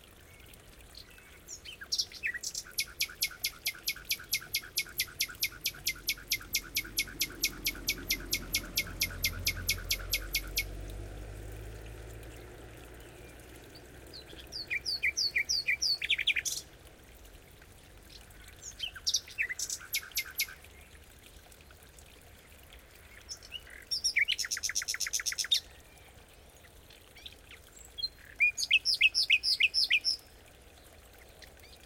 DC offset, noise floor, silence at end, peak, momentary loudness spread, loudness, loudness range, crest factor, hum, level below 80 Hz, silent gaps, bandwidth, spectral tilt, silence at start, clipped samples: under 0.1%; -56 dBFS; 0 s; -12 dBFS; 24 LU; -31 LUFS; 13 LU; 24 dB; none; -52 dBFS; none; 17 kHz; 0 dB/octave; 0 s; under 0.1%